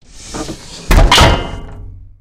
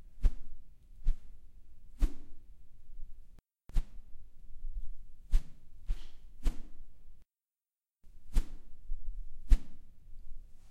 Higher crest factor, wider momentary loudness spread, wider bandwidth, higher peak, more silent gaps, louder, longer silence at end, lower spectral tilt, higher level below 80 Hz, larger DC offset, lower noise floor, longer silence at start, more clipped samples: second, 14 dB vs 24 dB; about the same, 22 LU vs 23 LU; first, 16.5 kHz vs 8.2 kHz; first, 0 dBFS vs -10 dBFS; neither; first, -10 LUFS vs -41 LUFS; first, 0.2 s vs 0 s; second, -4 dB/octave vs -6 dB/octave; first, -16 dBFS vs -36 dBFS; neither; second, -31 dBFS vs under -90 dBFS; first, 0.15 s vs 0 s; neither